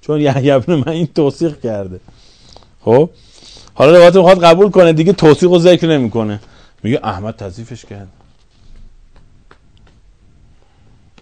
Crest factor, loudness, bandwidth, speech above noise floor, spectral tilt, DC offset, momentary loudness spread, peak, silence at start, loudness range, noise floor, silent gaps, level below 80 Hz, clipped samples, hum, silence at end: 12 dB; -10 LUFS; 12 kHz; 36 dB; -7 dB/octave; under 0.1%; 20 LU; 0 dBFS; 0.1 s; 17 LU; -46 dBFS; none; -44 dBFS; 2%; none; 2.35 s